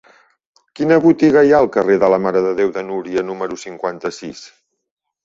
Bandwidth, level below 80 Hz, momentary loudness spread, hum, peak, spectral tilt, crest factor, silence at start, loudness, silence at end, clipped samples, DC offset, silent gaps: 7.8 kHz; -54 dBFS; 15 LU; none; -2 dBFS; -6.5 dB/octave; 16 dB; 0.8 s; -16 LUFS; 0.8 s; under 0.1%; under 0.1%; none